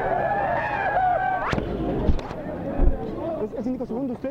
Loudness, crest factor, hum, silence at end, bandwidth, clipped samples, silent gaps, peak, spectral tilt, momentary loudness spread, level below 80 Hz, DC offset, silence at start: -26 LUFS; 18 dB; none; 0 s; 7.4 kHz; under 0.1%; none; -6 dBFS; -8 dB/octave; 8 LU; -28 dBFS; under 0.1%; 0 s